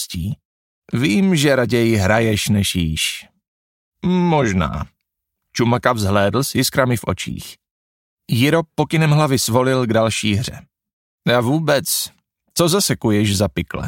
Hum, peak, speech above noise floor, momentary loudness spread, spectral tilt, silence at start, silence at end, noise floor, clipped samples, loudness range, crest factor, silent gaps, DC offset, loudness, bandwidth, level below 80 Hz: none; 0 dBFS; 60 dB; 11 LU; -5 dB/octave; 0 s; 0 s; -77 dBFS; under 0.1%; 2 LU; 18 dB; 0.45-0.82 s, 3.48-3.92 s, 7.71-8.17 s, 10.93-11.18 s; under 0.1%; -17 LUFS; 17 kHz; -42 dBFS